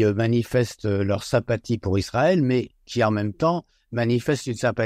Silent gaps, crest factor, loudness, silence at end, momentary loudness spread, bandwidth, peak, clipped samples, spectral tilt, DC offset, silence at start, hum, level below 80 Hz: none; 16 dB; -23 LUFS; 0 s; 5 LU; 15 kHz; -6 dBFS; under 0.1%; -6.5 dB/octave; under 0.1%; 0 s; none; -50 dBFS